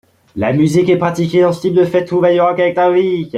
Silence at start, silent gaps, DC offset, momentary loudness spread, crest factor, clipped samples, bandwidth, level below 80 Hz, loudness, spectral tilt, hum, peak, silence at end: 0.35 s; none; under 0.1%; 3 LU; 12 dB; under 0.1%; 11 kHz; -52 dBFS; -13 LUFS; -7 dB/octave; none; -2 dBFS; 0 s